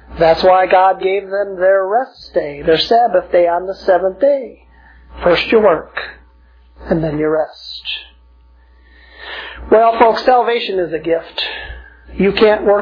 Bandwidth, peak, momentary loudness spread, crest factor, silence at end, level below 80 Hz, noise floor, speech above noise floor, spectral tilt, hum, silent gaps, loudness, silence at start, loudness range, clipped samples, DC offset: 5.4 kHz; 0 dBFS; 15 LU; 14 dB; 0 s; -40 dBFS; -46 dBFS; 33 dB; -6.5 dB/octave; none; none; -14 LUFS; 0.1 s; 8 LU; under 0.1%; under 0.1%